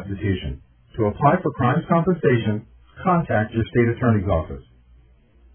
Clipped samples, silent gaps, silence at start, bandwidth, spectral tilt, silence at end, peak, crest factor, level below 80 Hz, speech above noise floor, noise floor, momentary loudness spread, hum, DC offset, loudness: under 0.1%; none; 0 s; 3.5 kHz; -12 dB/octave; 0.95 s; -2 dBFS; 20 dB; -40 dBFS; 33 dB; -53 dBFS; 13 LU; none; under 0.1%; -21 LUFS